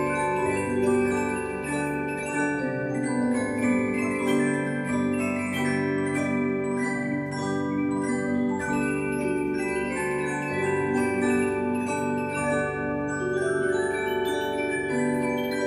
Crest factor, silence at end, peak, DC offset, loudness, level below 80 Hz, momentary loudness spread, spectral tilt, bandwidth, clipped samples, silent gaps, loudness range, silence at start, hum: 14 dB; 0 s; -12 dBFS; under 0.1%; -26 LUFS; -54 dBFS; 4 LU; -5.5 dB/octave; 14 kHz; under 0.1%; none; 1 LU; 0 s; none